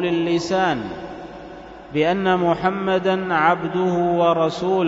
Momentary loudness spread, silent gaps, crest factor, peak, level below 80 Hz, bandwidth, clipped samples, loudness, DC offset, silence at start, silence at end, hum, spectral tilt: 17 LU; none; 18 dB; -2 dBFS; -52 dBFS; 7.8 kHz; under 0.1%; -20 LUFS; under 0.1%; 0 s; 0 s; none; -6.5 dB/octave